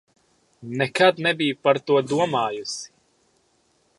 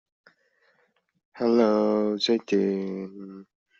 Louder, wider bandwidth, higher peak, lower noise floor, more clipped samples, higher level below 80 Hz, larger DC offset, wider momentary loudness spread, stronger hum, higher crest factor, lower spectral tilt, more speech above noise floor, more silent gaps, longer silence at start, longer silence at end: about the same, -22 LUFS vs -24 LUFS; first, 11.5 kHz vs 7.6 kHz; first, -2 dBFS vs -8 dBFS; second, -65 dBFS vs -69 dBFS; neither; about the same, -68 dBFS vs -72 dBFS; neither; second, 15 LU vs 18 LU; neither; about the same, 22 dB vs 18 dB; about the same, -4.5 dB/octave vs -4.5 dB/octave; about the same, 43 dB vs 45 dB; neither; second, 0.6 s vs 1.35 s; first, 1.1 s vs 0.35 s